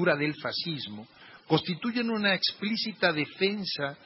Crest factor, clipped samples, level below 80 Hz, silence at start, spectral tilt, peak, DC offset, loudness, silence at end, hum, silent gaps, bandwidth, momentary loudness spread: 20 dB; under 0.1%; -70 dBFS; 0 s; -8.5 dB/octave; -10 dBFS; under 0.1%; -28 LUFS; 0.1 s; none; none; 5.8 kHz; 7 LU